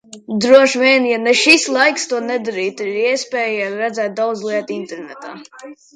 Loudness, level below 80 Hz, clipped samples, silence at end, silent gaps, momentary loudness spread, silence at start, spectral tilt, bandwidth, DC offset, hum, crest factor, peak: -15 LUFS; -68 dBFS; under 0.1%; 0.2 s; none; 18 LU; 0.1 s; -2.5 dB/octave; 11 kHz; under 0.1%; none; 16 dB; 0 dBFS